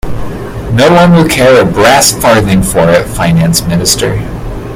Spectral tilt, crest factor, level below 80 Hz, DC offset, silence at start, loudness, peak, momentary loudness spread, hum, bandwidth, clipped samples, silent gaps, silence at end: -4.5 dB/octave; 8 dB; -24 dBFS; under 0.1%; 0.05 s; -7 LUFS; 0 dBFS; 15 LU; none; over 20 kHz; 1%; none; 0 s